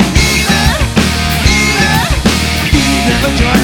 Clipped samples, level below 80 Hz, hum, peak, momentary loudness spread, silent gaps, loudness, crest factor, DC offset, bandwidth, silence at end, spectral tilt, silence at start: under 0.1%; -18 dBFS; none; 0 dBFS; 2 LU; none; -10 LUFS; 10 dB; under 0.1%; over 20 kHz; 0 s; -4 dB/octave; 0 s